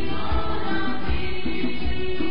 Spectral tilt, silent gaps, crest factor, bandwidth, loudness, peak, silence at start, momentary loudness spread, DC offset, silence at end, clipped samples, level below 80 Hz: -10.5 dB/octave; none; 14 dB; 5.4 kHz; -28 LUFS; -10 dBFS; 0 s; 2 LU; 10%; 0 s; under 0.1%; -32 dBFS